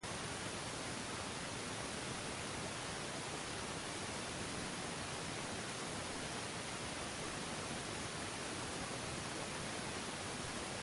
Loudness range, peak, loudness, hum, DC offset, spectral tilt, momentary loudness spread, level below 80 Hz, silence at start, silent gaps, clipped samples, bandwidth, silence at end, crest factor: 0 LU; -30 dBFS; -43 LUFS; none; under 0.1%; -3 dB/octave; 0 LU; -62 dBFS; 0 s; none; under 0.1%; 11.5 kHz; 0 s; 14 dB